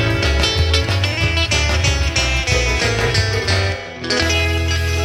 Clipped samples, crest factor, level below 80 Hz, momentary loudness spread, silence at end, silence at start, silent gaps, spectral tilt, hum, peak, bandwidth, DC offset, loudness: under 0.1%; 16 dB; -24 dBFS; 3 LU; 0 s; 0 s; none; -3.5 dB/octave; none; -2 dBFS; 15 kHz; under 0.1%; -16 LUFS